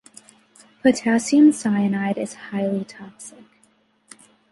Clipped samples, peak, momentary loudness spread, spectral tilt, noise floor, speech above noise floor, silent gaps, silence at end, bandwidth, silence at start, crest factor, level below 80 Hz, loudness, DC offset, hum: under 0.1%; -4 dBFS; 23 LU; -5.5 dB/octave; -61 dBFS; 41 dB; none; 1.2 s; 11.5 kHz; 0.85 s; 18 dB; -66 dBFS; -20 LUFS; under 0.1%; none